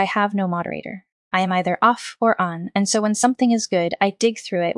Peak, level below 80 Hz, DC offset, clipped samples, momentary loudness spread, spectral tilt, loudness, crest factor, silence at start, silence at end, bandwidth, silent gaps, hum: -2 dBFS; -68 dBFS; under 0.1%; under 0.1%; 8 LU; -4.5 dB/octave; -20 LUFS; 18 dB; 0 s; 0.05 s; 12 kHz; 1.12-1.31 s; none